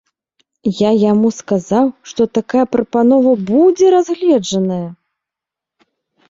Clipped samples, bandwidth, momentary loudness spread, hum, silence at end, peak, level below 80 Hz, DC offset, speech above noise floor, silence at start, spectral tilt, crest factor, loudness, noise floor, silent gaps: under 0.1%; 7.8 kHz; 9 LU; none; 1.35 s; -2 dBFS; -56 dBFS; under 0.1%; 71 dB; 0.65 s; -6.5 dB/octave; 12 dB; -14 LUFS; -84 dBFS; none